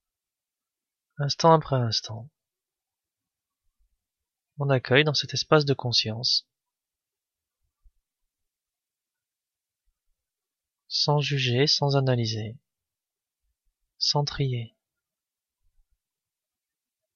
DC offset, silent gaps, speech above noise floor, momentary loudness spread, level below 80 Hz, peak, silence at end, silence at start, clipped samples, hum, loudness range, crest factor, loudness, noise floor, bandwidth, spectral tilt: under 0.1%; none; 66 dB; 12 LU; -62 dBFS; -4 dBFS; 2.5 s; 1.2 s; under 0.1%; none; 7 LU; 24 dB; -24 LUFS; -90 dBFS; 7.2 kHz; -5 dB/octave